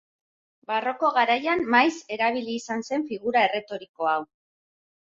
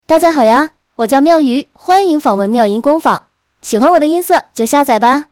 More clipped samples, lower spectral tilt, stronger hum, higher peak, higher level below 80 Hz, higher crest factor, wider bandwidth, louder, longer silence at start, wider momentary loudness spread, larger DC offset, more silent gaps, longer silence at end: neither; about the same, -3.5 dB/octave vs -4.5 dB/octave; neither; second, -6 dBFS vs 0 dBFS; second, -68 dBFS vs -52 dBFS; first, 20 dB vs 10 dB; second, 7.8 kHz vs 18.5 kHz; second, -24 LUFS vs -11 LUFS; first, 0.7 s vs 0.1 s; about the same, 9 LU vs 9 LU; neither; first, 3.89-3.94 s vs none; first, 0.8 s vs 0.1 s